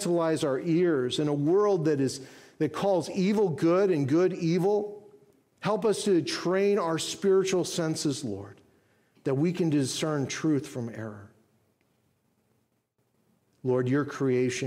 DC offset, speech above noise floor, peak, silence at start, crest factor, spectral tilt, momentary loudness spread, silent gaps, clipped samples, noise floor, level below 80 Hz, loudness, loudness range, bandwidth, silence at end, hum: under 0.1%; 48 dB; -14 dBFS; 0 s; 14 dB; -5.5 dB/octave; 10 LU; none; under 0.1%; -74 dBFS; -72 dBFS; -27 LUFS; 8 LU; 15 kHz; 0 s; none